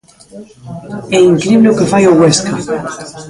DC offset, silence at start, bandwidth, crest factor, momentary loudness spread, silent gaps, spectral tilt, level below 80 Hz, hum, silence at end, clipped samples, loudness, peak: under 0.1%; 0.35 s; 11.5 kHz; 12 dB; 18 LU; none; -5 dB/octave; -46 dBFS; none; 0 s; under 0.1%; -10 LUFS; 0 dBFS